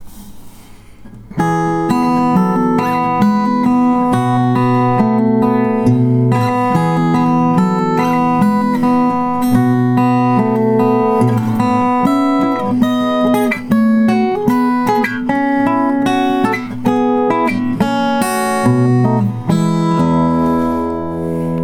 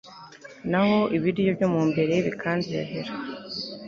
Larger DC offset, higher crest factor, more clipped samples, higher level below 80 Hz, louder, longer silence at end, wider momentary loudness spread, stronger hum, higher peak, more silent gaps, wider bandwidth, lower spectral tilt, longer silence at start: neither; about the same, 14 dB vs 16 dB; neither; first, -44 dBFS vs -60 dBFS; first, -14 LUFS vs -25 LUFS; about the same, 0 s vs 0 s; second, 3 LU vs 14 LU; neither; first, 0 dBFS vs -10 dBFS; neither; first, 16 kHz vs 7.4 kHz; about the same, -7.5 dB/octave vs -7 dB/octave; about the same, 0 s vs 0.05 s